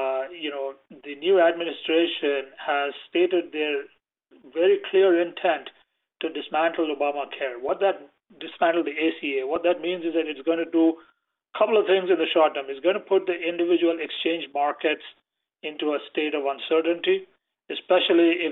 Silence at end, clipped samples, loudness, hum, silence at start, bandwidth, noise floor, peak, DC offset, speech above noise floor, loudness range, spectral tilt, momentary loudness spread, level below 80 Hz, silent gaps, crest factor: 0 s; under 0.1%; -24 LUFS; none; 0 s; 4.1 kHz; -59 dBFS; -8 dBFS; under 0.1%; 36 dB; 3 LU; -7 dB/octave; 12 LU; -74 dBFS; none; 16 dB